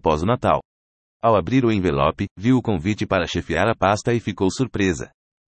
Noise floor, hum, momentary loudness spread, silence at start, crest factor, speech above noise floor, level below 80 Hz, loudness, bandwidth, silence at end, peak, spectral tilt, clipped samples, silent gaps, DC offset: under -90 dBFS; none; 5 LU; 0.05 s; 16 dB; over 70 dB; -44 dBFS; -21 LUFS; 8.8 kHz; 0.5 s; -4 dBFS; -6 dB/octave; under 0.1%; 0.65-1.20 s, 2.31-2.36 s; under 0.1%